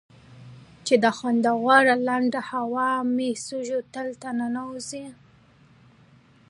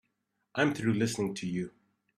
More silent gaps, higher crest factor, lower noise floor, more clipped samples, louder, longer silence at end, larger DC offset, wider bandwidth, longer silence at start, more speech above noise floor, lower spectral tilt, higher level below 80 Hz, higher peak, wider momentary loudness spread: neither; about the same, 22 dB vs 20 dB; second, -55 dBFS vs -80 dBFS; neither; first, -24 LUFS vs -31 LUFS; first, 1.35 s vs 0.5 s; neither; second, 11.5 kHz vs 14 kHz; second, 0.3 s vs 0.55 s; second, 32 dB vs 50 dB; second, -4 dB/octave vs -5.5 dB/octave; about the same, -68 dBFS vs -66 dBFS; first, -4 dBFS vs -12 dBFS; first, 16 LU vs 10 LU